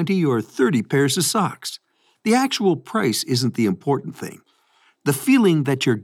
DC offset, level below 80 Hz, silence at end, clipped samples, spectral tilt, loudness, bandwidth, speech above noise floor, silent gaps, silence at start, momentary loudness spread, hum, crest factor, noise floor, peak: under 0.1%; -76 dBFS; 0 s; under 0.1%; -5 dB/octave; -20 LUFS; 17 kHz; 40 dB; none; 0 s; 14 LU; none; 16 dB; -60 dBFS; -6 dBFS